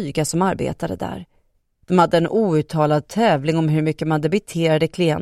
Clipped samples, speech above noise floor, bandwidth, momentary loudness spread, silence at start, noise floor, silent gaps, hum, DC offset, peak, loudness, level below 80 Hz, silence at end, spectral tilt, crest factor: under 0.1%; 43 dB; 14 kHz; 9 LU; 0 s; -62 dBFS; none; none; under 0.1%; -2 dBFS; -19 LUFS; -50 dBFS; 0 s; -6 dB/octave; 18 dB